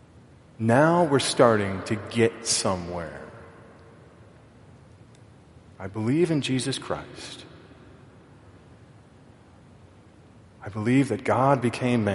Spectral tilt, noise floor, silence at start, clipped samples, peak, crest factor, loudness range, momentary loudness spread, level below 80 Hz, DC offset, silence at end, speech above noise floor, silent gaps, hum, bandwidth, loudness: -5 dB/octave; -52 dBFS; 0.6 s; under 0.1%; -4 dBFS; 24 dB; 17 LU; 20 LU; -60 dBFS; under 0.1%; 0 s; 28 dB; none; none; 11.5 kHz; -24 LUFS